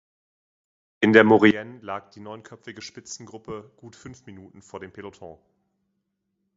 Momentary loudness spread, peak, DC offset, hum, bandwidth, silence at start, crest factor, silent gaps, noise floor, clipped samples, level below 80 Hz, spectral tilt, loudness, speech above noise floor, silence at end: 26 LU; 0 dBFS; under 0.1%; none; 7.8 kHz; 1 s; 26 dB; none; -77 dBFS; under 0.1%; -64 dBFS; -5.5 dB/octave; -17 LUFS; 53 dB; 1.25 s